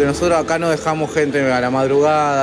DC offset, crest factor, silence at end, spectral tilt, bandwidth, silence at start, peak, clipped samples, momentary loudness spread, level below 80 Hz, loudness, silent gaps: under 0.1%; 10 dB; 0 s; -5.5 dB/octave; 11 kHz; 0 s; -6 dBFS; under 0.1%; 4 LU; -42 dBFS; -16 LUFS; none